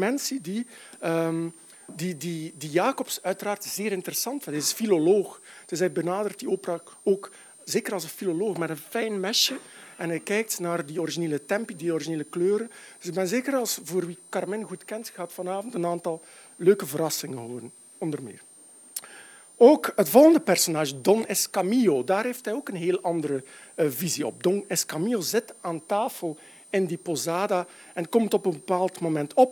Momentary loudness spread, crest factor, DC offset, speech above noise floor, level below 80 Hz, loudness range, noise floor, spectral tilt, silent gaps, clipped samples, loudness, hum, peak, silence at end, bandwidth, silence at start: 14 LU; 22 dB; under 0.1%; 22 dB; -82 dBFS; 8 LU; -48 dBFS; -4 dB/octave; none; under 0.1%; -26 LUFS; none; -4 dBFS; 0 s; 19.5 kHz; 0 s